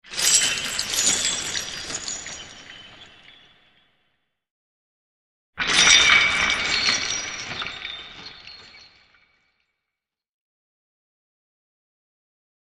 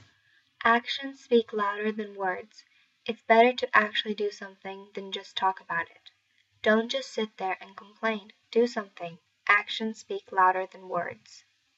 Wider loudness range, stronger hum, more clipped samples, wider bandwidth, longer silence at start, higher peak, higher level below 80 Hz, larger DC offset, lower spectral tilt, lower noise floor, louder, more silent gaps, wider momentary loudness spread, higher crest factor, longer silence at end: first, 18 LU vs 4 LU; neither; neither; first, 13.5 kHz vs 8 kHz; second, 0.05 s vs 0.6 s; first, 0 dBFS vs -6 dBFS; first, -54 dBFS vs -82 dBFS; neither; second, 1 dB/octave vs -4 dB/octave; first, -86 dBFS vs -69 dBFS; first, -19 LUFS vs -28 LUFS; first, 4.51-5.53 s vs none; first, 26 LU vs 16 LU; about the same, 26 dB vs 24 dB; first, 3.9 s vs 0.4 s